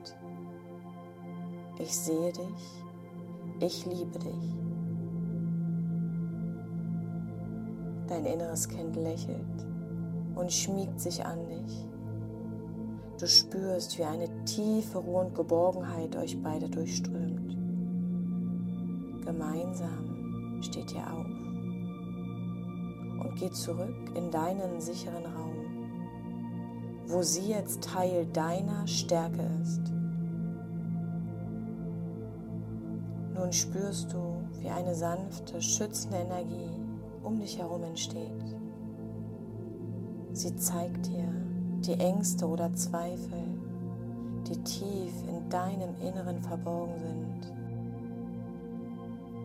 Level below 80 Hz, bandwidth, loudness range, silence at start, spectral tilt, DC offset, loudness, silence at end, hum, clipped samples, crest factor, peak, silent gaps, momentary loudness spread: -60 dBFS; 16 kHz; 7 LU; 0 s; -5 dB/octave; under 0.1%; -34 LUFS; 0 s; none; under 0.1%; 24 dB; -10 dBFS; none; 11 LU